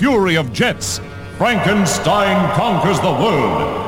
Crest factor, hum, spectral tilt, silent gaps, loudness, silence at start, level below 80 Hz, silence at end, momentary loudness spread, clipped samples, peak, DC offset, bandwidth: 14 dB; none; -4.5 dB/octave; none; -16 LUFS; 0 s; -40 dBFS; 0 s; 7 LU; under 0.1%; 0 dBFS; under 0.1%; 17 kHz